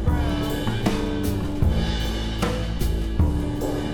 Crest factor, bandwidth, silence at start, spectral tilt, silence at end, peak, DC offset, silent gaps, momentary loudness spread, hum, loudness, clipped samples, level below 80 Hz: 16 dB; 19.5 kHz; 0 s; -6.5 dB/octave; 0 s; -6 dBFS; under 0.1%; none; 3 LU; none; -25 LUFS; under 0.1%; -26 dBFS